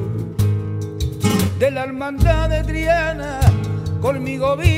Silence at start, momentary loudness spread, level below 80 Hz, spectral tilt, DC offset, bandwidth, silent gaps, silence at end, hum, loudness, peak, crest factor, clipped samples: 0 s; 7 LU; -26 dBFS; -6.5 dB/octave; under 0.1%; 16 kHz; none; 0 s; none; -19 LUFS; -2 dBFS; 16 dB; under 0.1%